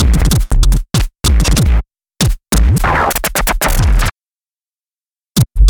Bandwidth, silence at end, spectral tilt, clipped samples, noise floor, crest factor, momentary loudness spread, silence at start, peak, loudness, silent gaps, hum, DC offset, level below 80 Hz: 19.5 kHz; 0 s; -4.5 dB/octave; under 0.1%; under -90 dBFS; 12 dB; 5 LU; 0 s; 0 dBFS; -14 LUFS; 4.35-4.39 s; none; under 0.1%; -14 dBFS